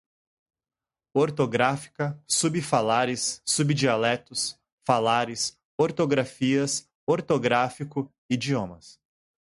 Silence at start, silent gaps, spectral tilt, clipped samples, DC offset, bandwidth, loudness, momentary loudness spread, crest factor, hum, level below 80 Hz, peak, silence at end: 1.15 s; 4.72-4.78 s, 5.65-5.78 s, 6.95-7.07 s, 8.18-8.29 s; -4 dB/octave; under 0.1%; under 0.1%; 11.5 kHz; -25 LUFS; 8 LU; 20 dB; none; -64 dBFS; -6 dBFS; 0.65 s